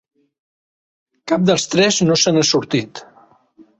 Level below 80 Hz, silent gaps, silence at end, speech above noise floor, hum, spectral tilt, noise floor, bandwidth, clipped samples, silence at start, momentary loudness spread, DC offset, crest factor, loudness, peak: -58 dBFS; none; 0.75 s; 35 dB; none; -4 dB/octave; -51 dBFS; 8.2 kHz; under 0.1%; 1.25 s; 20 LU; under 0.1%; 16 dB; -15 LUFS; -2 dBFS